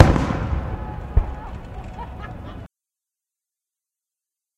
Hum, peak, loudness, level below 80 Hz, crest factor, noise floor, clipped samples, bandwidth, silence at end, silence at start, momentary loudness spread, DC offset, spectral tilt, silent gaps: none; 0 dBFS; -26 LUFS; -30 dBFS; 24 dB; -87 dBFS; under 0.1%; 10.5 kHz; 1.9 s; 0 s; 15 LU; under 0.1%; -7.5 dB/octave; none